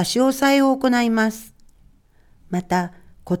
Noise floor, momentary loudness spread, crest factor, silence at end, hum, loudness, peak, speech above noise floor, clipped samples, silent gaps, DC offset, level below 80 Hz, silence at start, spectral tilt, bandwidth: -53 dBFS; 12 LU; 18 dB; 0 s; none; -19 LUFS; -4 dBFS; 35 dB; under 0.1%; none; under 0.1%; -52 dBFS; 0 s; -5 dB/octave; 17.5 kHz